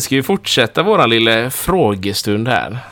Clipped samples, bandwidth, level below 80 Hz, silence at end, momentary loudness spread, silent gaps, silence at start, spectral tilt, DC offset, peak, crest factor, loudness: under 0.1%; 19 kHz; -42 dBFS; 0 s; 6 LU; none; 0 s; -4 dB/octave; under 0.1%; 0 dBFS; 14 dB; -14 LUFS